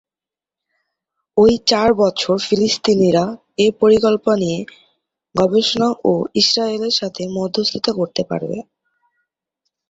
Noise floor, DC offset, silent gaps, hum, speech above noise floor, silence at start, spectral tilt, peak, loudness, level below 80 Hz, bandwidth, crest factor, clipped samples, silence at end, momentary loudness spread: -89 dBFS; under 0.1%; none; none; 73 dB; 1.35 s; -4.5 dB/octave; -2 dBFS; -16 LUFS; -52 dBFS; 8 kHz; 16 dB; under 0.1%; 1.3 s; 11 LU